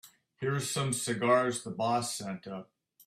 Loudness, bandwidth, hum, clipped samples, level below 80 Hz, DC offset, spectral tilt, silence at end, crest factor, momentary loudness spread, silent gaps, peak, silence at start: -31 LUFS; 16 kHz; none; under 0.1%; -70 dBFS; under 0.1%; -4 dB/octave; 0.4 s; 20 dB; 14 LU; none; -14 dBFS; 0.05 s